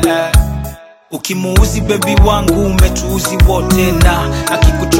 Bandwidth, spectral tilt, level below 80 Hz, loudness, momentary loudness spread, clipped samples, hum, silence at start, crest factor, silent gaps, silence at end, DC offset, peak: 17 kHz; -5 dB/octave; -14 dBFS; -12 LUFS; 9 LU; 0.2%; none; 0 s; 10 dB; none; 0 s; under 0.1%; 0 dBFS